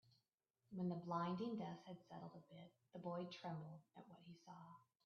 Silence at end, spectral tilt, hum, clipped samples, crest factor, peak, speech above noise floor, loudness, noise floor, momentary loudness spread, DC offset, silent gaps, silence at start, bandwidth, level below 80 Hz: 0.2 s; -6.5 dB/octave; none; under 0.1%; 20 dB; -30 dBFS; 38 dB; -50 LUFS; -89 dBFS; 18 LU; under 0.1%; none; 0.7 s; 6.6 kHz; -90 dBFS